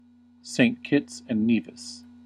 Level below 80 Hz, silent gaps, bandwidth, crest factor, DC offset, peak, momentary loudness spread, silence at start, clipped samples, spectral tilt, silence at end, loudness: -70 dBFS; none; 11 kHz; 20 dB; under 0.1%; -8 dBFS; 17 LU; 0.45 s; under 0.1%; -5 dB/octave; 0.25 s; -25 LUFS